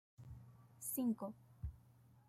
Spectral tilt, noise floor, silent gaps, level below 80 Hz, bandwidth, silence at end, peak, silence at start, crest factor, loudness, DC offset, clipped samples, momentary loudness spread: -6.5 dB/octave; -67 dBFS; none; -60 dBFS; 16 kHz; 0.1 s; -30 dBFS; 0.2 s; 16 dB; -45 LUFS; under 0.1%; under 0.1%; 21 LU